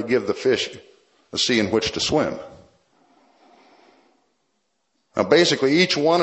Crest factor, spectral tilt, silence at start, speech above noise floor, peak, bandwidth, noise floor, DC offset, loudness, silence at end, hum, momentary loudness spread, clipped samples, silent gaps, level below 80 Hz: 22 dB; -4 dB/octave; 0 s; 52 dB; 0 dBFS; 8.4 kHz; -72 dBFS; under 0.1%; -20 LUFS; 0 s; none; 13 LU; under 0.1%; none; -56 dBFS